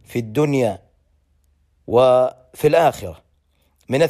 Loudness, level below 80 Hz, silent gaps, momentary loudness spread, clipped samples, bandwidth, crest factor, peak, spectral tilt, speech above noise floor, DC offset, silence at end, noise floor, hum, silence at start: -18 LUFS; -52 dBFS; none; 16 LU; under 0.1%; 15 kHz; 16 dB; -4 dBFS; -6.5 dB/octave; 45 dB; under 0.1%; 0 s; -62 dBFS; none; 0.1 s